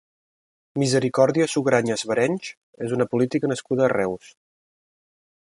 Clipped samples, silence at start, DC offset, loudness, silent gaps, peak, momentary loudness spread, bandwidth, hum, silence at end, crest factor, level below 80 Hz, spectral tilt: under 0.1%; 0.75 s; under 0.1%; -22 LUFS; 2.57-2.73 s; -2 dBFS; 12 LU; 11.5 kHz; none; 1.4 s; 22 dB; -64 dBFS; -5.5 dB/octave